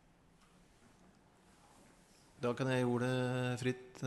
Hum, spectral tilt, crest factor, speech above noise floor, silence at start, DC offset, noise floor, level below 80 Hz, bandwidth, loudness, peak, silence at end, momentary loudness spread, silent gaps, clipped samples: none; -6.5 dB/octave; 16 dB; 31 dB; 2.4 s; under 0.1%; -67 dBFS; -72 dBFS; 12 kHz; -37 LUFS; -24 dBFS; 0 s; 6 LU; none; under 0.1%